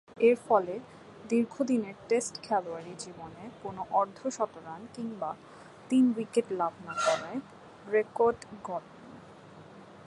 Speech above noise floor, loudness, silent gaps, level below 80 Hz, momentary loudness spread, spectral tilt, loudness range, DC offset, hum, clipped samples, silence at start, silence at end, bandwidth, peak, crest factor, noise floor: 21 dB; -30 LUFS; none; -72 dBFS; 24 LU; -5 dB/octave; 5 LU; under 0.1%; none; under 0.1%; 0.15 s; 0.05 s; 11.5 kHz; -10 dBFS; 20 dB; -51 dBFS